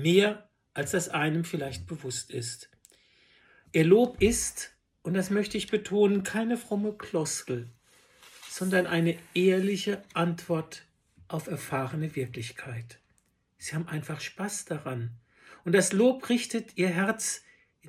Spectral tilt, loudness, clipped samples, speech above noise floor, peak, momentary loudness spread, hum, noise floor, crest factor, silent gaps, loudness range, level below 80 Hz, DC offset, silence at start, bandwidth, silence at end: -5 dB/octave; -29 LUFS; under 0.1%; 43 dB; -8 dBFS; 16 LU; none; -71 dBFS; 22 dB; none; 9 LU; -58 dBFS; under 0.1%; 0 s; 15.5 kHz; 0 s